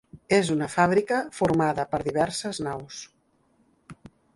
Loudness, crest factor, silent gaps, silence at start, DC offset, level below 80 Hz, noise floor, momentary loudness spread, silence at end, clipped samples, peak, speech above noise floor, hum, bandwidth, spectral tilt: -25 LUFS; 18 dB; none; 0.15 s; under 0.1%; -56 dBFS; -66 dBFS; 11 LU; 0.4 s; under 0.1%; -8 dBFS; 41 dB; none; 11.5 kHz; -5 dB/octave